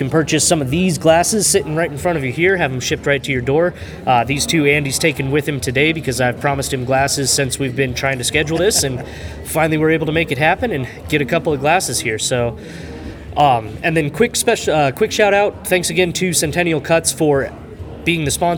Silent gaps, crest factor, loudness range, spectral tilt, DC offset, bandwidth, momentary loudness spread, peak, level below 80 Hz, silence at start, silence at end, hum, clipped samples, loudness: none; 16 dB; 2 LU; -4 dB/octave; under 0.1%; 19.5 kHz; 7 LU; 0 dBFS; -40 dBFS; 0 s; 0 s; none; under 0.1%; -16 LUFS